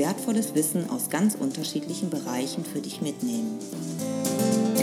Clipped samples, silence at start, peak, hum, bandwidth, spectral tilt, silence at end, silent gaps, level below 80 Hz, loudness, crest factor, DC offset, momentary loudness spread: under 0.1%; 0 s; -10 dBFS; none; 16.5 kHz; -4.5 dB/octave; 0 s; none; -78 dBFS; -27 LUFS; 16 dB; under 0.1%; 8 LU